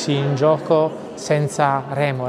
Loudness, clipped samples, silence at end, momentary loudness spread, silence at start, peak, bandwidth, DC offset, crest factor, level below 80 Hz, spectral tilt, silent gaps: -19 LUFS; under 0.1%; 0 s; 5 LU; 0 s; -4 dBFS; 12 kHz; under 0.1%; 16 dB; -62 dBFS; -6 dB/octave; none